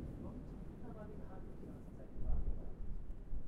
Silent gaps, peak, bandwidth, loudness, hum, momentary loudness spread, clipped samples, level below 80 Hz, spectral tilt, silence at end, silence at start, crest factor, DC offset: none; -24 dBFS; 2.6 kHz; -50 LUFS; none; 8 LU; under 0.1%; -44 dBFS; -9.5 dB/octave; 0 s; 0 s; 18 dB; under 0.1%